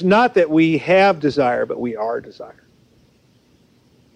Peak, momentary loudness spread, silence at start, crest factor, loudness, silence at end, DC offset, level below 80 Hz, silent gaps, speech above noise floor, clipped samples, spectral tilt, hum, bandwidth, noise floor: -4 dBFS; 20 LU; 0 s; 16 dB; -17 LUFS; 1.65 s; under 0.1%; -58 dBFS; none; 39 dB; under 0.1%; -7 dB/octave; none; 9.4 kHz; -56 dBFS